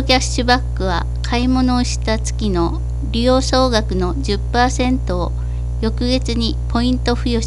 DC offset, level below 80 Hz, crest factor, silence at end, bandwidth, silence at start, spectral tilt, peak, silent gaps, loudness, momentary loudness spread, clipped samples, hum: under 0.1%; -22 dBFS; 16 dB; 0 s; 11.5 kHz; 0 s; -5 dB/octave; 0 dBFS; none; -18 LUFS; 6 LU; under 0.1%; 60 Hz at -20 dBFS